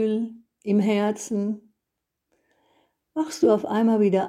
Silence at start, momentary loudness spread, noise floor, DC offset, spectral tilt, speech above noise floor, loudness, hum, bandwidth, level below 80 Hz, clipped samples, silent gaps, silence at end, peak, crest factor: 0 s; 14 LU; -82 dBFS; under 0.1%; -6.5 dB/octave; 61 dB; -24 LUFS; none; 13 kHz; -74 dBFS; under 0.1%; none; 0 s; -6 dBFS; 18 dB